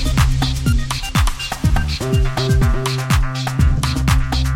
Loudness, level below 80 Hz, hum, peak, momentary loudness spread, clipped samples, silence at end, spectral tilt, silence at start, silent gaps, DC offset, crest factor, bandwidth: -18 LUFS; -20 dBFS; none; -2 dBFS; 4 LU; under 0.1%; 0 s; -5 dB/octave; 0 s; none; under 0.1%; 14 dB; 16.5 kHz